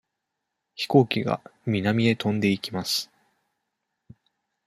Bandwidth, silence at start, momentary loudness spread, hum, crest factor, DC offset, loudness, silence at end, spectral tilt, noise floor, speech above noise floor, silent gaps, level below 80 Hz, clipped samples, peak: 15.5 kHz; 0.8 s; 11 LU; none; 22 dB; under 0.1%; -24 LUFS; 1.6 s; -5.5 dB/octave; -82 dBFS; 58 dB; none; -64 dBFS; under 0.1%; -4 dBFS